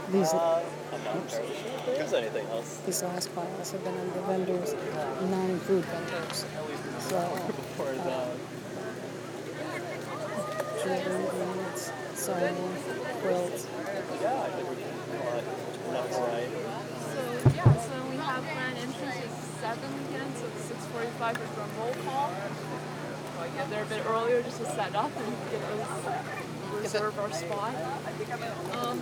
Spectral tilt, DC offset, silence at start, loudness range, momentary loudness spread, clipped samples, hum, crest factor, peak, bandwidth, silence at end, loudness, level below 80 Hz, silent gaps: -5 dB/octave; under 0.1%; 0 s; 5 LU; 8 LU; under 0.1%; none; 22 dB; -10 dBFS; over 20 kHz; 0 s; -32 LUFS; -60 dBFS; none